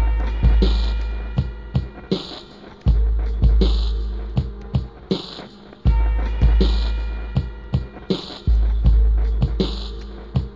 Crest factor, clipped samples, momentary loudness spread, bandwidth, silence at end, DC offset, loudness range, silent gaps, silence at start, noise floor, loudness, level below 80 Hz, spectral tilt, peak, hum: 16 dB; under 0.1%; 9 LU; 7.4 kHz; 0 s; 0.2%; 1 LU; none; 0 s; -40 dBFS; -22 LUFS; -20 dBFS; -8 dB/octave; -4 dBFS; none